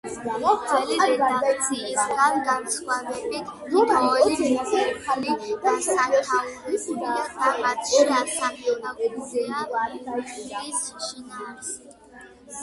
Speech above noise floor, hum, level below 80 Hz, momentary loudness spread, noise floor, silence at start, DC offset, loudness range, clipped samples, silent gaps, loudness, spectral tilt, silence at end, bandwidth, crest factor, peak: 24 dB; none; -62 dBFS; 13 LU; -47 dBFS; 0.05 s; under 0.1%; 7 LU; under 0.1%; none; -24 LUFS; -2 dB/octave; 0 s; 12 kHz; 18 dB; -6 dBFS